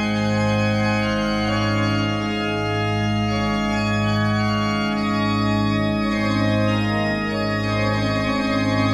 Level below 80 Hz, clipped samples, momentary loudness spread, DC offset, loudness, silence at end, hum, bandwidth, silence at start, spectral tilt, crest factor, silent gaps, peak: -40 dBFS; under 0.1%; 2 LU; under 0.1%; -21 LUFS; 0 s; none; 10.5 kHz; 0 s; -6.5 dB/octave; 12 dB; none; -8 dBFS